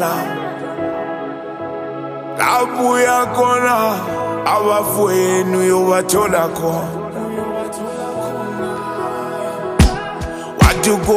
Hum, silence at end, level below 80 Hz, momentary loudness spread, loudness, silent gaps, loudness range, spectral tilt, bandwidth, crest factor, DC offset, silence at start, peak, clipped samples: none; 0 s; -30 dBFS; 12 LU; -17 LUFS; none; 6 LU; -5 dB/octave; 15.5 kHz; 16 dB; under 0.1%; 0 s; 0 dBFS; under 0.1%